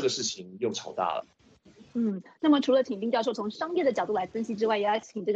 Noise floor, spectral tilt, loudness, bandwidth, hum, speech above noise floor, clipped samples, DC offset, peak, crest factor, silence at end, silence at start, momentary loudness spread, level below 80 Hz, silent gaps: -56 dBFS; -4 dB/octave; -28 LUFS; 8.2 kHz; none; 28 dB; under 0.1%; under 0.1%; -12 dBFS; 16 dB; 0 s; 0 s; 8 LU; -72 dBFS; none